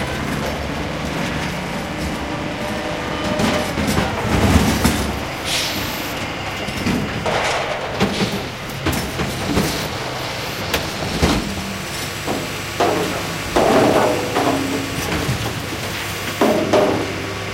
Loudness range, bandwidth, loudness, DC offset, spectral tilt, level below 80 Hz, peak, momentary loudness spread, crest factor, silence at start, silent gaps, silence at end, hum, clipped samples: 3 LU; 16 kHz; -20 LUFS; 0.1%; -4.5 dB/octave; -34 dBFS; 0 dBFS; 8 LU; 20 dB; 0 s; none; 0 s; none; under 0.1%